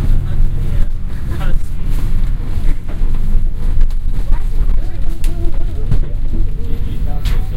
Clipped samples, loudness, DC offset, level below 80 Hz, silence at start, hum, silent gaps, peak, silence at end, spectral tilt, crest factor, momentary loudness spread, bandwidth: 0.1%; -22 LUFS; under 0.1%; -12 dBFS; 0 s; none; none; 0 dBFS; 0 s; -7 dB/octave; 10 dB; 3 LU; 4.4 kHz